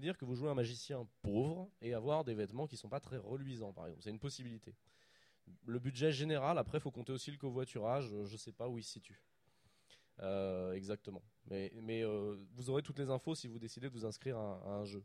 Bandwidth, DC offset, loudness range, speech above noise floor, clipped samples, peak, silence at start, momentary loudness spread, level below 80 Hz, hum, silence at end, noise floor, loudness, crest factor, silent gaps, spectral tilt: 13 kHz; under 0.1%; 6 LU; 33 dB; under 0.1%; -24 dBFS; 0 s; 11 LU; -70 dBFS; none; 0 s; -75 dBFS; -42 LUFS; 20 dB; none; -6 dB/octave